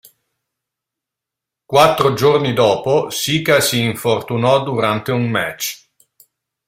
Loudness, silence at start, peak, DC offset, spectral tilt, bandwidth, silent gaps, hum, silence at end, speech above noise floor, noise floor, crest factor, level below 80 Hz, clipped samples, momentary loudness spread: -16 LUFS; 1.7 s; 0 dBFS; under 0.1%; -4.5 dB/octave; 16 kHz; none; none; 0.9 s; 68 dB; -84 dBFS; 18 dB; -54 dBFS; under 0.1%; 7 LU